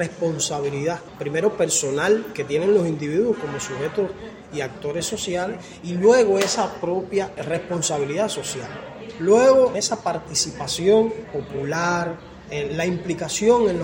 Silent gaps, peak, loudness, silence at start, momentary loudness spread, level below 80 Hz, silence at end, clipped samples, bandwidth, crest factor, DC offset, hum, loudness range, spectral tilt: none; -4 dBFS; -22 LUFS; 0 s; 13 LU; -54 dBFS; 0 s; under 0.1%; 16.5 kHz; 16 dB; under 0.1%; none; 4 LU; -4 dB/octave